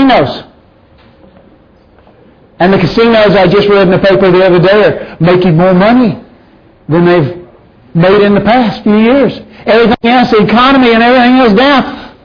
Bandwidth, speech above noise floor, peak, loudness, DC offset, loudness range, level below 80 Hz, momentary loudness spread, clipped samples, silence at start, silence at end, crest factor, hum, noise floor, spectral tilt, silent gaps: 5.4 kHz; 36 dB; 0 dBFS; -7 LUFS; under 0.1%; 4 LU; -36 dBFS; 8 LU; 0.2%; 0 s; 0.15 s; 8 dB; none; -42 dBFS; -8 dB/octave; none